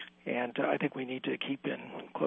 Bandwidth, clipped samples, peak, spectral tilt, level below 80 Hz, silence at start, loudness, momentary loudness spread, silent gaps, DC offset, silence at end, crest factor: 3.9 kHz; under 0.1%; -16 dBFS; -8 dB/octave; -82 dBFS; 0 s; -35 LUFS; 7 LU; none; under 0.1%; 0 s; 20 dB